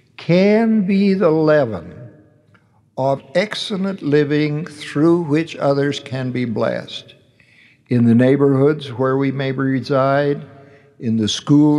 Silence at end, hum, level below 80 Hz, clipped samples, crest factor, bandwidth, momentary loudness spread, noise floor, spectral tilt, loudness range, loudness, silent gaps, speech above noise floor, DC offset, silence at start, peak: 0 s; none; -66 dBFS; under 0.1%; 14 dB; 11 kHz; 10 LU; -54 dBFS; -7 dB/octave; 3 LU; -17 LUFS; none; 38 dB; under 0.1%; 0.2 s; -2 dBFS